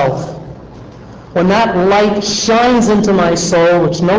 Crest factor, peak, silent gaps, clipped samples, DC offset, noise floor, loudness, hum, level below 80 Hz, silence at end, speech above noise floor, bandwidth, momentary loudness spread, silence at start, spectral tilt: 8 dB; -4 dBFS; none; under 0.1%; under 0.1%; -33 dBFS; -11 LUFS; none; -38 dBFS; 0 s; 22 dB; 8 kHz; 12 LU; 0 s; -5 dB/octave